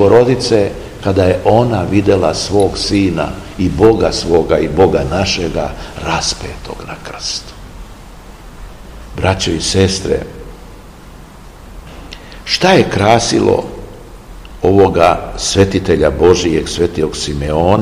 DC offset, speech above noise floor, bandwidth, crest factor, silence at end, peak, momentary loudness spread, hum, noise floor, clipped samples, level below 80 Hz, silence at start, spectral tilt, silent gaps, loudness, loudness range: 0.3%; 22 dB; 15.5 kHz; 14 dB; 0 s; 0 dBFS; 19 LU; none; -35 dBFS; 0.6%; -30 dBFS; 0 s; -5 dB/octave; none; -13 LUFS; 7 LU